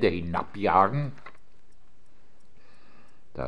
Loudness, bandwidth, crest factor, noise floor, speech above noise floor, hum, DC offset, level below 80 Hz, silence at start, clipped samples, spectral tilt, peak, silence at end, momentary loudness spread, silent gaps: -26 LUFS; 10 kHz; 24 dB; -63 dBFS; 38 dB; none; 1%; -54 dBFS; 0 s; under 0.1%; -8 dB/octave; -6 dBFS; 0 s; 21 LU; none